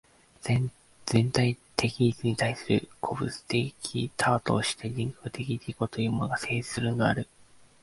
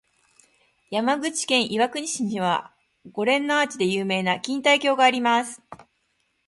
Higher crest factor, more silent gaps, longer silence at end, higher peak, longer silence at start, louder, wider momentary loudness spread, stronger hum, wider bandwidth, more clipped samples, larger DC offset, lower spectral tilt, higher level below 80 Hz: first, 26 dB vs 20 dB; neither; about the same, 0.6 s vs 0.7 s; about the same, -4 dBFS vs -4 dBFS; second, 0.45 s vs 0.9 s; second, -29 LUFS vs -22 LUFS; about the same, 8 LU vs 8 LU; neither; about the same, 11.5 kHz vs 11.5 kHz; neither; neither; first, -5.5 dB/octave vs -3 dB/octave; first, -56 dBFS vs -70 dBFS